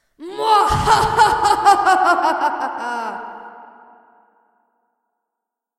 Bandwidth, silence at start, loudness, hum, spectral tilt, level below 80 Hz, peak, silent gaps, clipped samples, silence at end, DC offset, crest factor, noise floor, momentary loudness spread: 14.5 kHz; 0.2 s; -16 LUFS; none; -3.5 dB/octave; -40 dBFS; 0 dBFS; none; under 0.1%; 2.15 s; under 0.1%; 18 dB; -82 dBFS; 17 LU